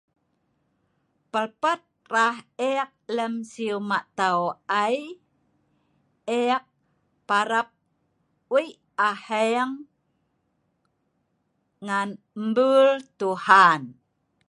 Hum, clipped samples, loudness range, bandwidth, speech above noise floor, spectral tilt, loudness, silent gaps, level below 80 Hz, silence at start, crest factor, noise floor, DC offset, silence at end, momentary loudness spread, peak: none; under 0.1%; 7 LU; 11.5 kHz; 50 dB; -4 dB/octave; -24 LUFS; none; -80 dBFS; 1.35 s; 24 dB; -73 dBFS; under 0.1%; 0.55 s; 13 LU; -2 dBFS